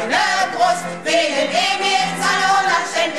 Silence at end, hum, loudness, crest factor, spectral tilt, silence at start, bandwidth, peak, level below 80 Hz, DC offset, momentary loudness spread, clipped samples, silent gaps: 0 s; none; -17 LUFS; 12 dB; -2 dB/octave; 0 s; 14.5 kHz; -4 dBFS; -60 dBFS; 0.6%; 3 LU; under 0.1%; none